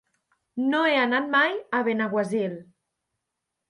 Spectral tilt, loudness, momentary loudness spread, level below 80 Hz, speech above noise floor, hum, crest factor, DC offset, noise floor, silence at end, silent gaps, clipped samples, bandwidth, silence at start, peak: -5.5 dB/octave; -24 LUFS; 10 LU; -78 dBFS; 59 dB; none; 18 dB; under 0.1%; -83 dBFS; 1.05 s; none; under 0.1%; 11 kHz; 0.55 s; -10 dBFS